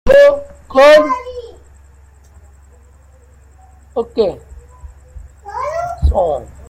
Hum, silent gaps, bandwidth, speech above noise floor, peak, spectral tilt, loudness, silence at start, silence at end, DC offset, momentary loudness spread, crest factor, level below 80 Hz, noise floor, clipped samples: none; none; 12.5 kHz; 33 dB; 0 dBFS; -5.5 dB/octave; -13 LUFS; 0.05 s; 0.25 s; under 0.1%; 22 LU; 16 dB; -28 dBFS; -44 dBFS; under 0.1%